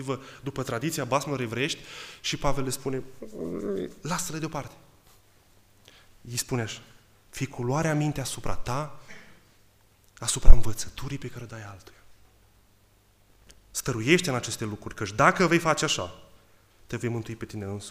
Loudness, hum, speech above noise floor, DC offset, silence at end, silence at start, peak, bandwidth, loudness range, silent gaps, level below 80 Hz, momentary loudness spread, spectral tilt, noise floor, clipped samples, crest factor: -29 LUFS; none; 38 dB; under 0.1%; 0 s; 0 s; 0 dBFS; 15 kHz; 10 LU; none; -30 dBFS; 17 LU; -4.5 dB/octave; -61 dBFS; under 0.1%; 24 dB